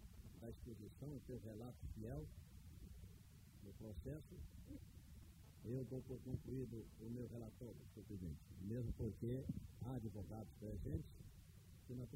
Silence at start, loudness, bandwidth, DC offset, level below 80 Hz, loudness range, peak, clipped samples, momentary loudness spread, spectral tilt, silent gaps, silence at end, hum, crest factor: 0 s; -53 LUFS; 16 kHz; under 0.1%; -60 dBFS; 6 LU; -34 dBFS; under 0.1%; 14 LU; -8 dB/octave; none; 0 s; none; 18 dB